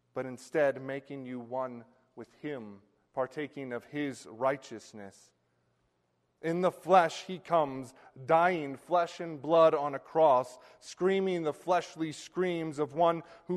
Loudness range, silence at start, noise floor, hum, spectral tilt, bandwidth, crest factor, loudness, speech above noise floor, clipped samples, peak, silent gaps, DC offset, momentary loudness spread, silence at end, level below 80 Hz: 10 LU; 0.15 s; -76 dBFS; none; -6 dB/octave; 12.5 kHz; 22 dB; -31 LUFS; 45 dB; under 0.1%; -10 dBFS; none; under 0.1%; 21 LU; 0 s; -78 dBFS